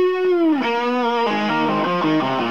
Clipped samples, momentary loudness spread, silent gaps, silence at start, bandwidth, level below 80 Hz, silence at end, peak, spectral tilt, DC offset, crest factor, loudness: under 0.1%; 2 LU; none; 0 s; 7.2 kHz; -62 dBFS; 0 s; -8 dBFS; -6.5 dB/octave; 0.5%; 10 dB; -19 LUFS